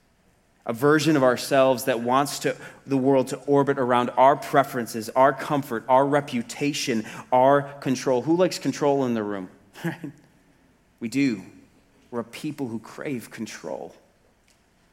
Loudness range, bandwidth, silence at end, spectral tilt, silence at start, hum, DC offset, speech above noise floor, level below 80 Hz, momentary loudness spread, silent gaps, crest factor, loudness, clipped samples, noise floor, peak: 10 LU; 16.5 kHz; 1.05 s; -5.5 dB/octave; 0.65 s; none; under 0.1%; 39 dB; -68 dBFS; 16 LU; none; 20 dB; -23 LUFS; under 0.1%; -62 dBFS; -4 dBFS